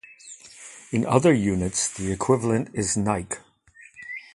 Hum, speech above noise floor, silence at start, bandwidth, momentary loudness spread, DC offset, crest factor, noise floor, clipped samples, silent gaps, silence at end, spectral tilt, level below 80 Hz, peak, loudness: none; 30 dB; 0.25 s; 11.5 kHz; 22 LU; under 0.1%; 24 dB; -53 dBFS; under 0.1%; none; 0.15 s; -5 dB/octave; -48 dBFS; -2 dBFS; -23 LUFS